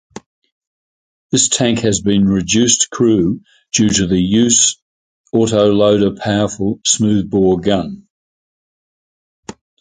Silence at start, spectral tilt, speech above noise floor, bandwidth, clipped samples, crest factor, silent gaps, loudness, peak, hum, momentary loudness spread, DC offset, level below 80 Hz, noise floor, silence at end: 0.15 s; -4 dB/octave; over 76 dB; 9.6 kHz; under 0.1%; 16 dB; 0.26-0.42 s, 0.52-0.61 s, 0.67-1.30 s, 4.82-5.24 s, 8.10-9.43 s; -14 LUFS; 0 dBFS; none; 7 LU; under 0.1%; -42 dBFS; under -90 dBFS; 0.3 s